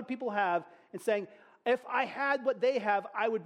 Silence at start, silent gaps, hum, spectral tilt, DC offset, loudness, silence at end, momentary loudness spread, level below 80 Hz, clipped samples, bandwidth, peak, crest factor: 0 s; none; none; -5 dB/octave; under 0.1%; -32 LUFS; 0 s; 8 LU; -84 dBFS; under 0.1%; 13.5 kHz; -16 dBFS; 16 dB